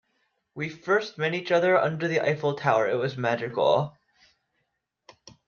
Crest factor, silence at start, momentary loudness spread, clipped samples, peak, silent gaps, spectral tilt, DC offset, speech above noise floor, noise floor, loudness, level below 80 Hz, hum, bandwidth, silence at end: 20 dB; 0.55 s; 12 LU; under 0.1%; -6 dBFS; none; -6 dB/octave; under 0.1%; 53 dB; -78 dBFS; -25 LUFS; -70 dBFS; none; 7 kHz; 1.55 s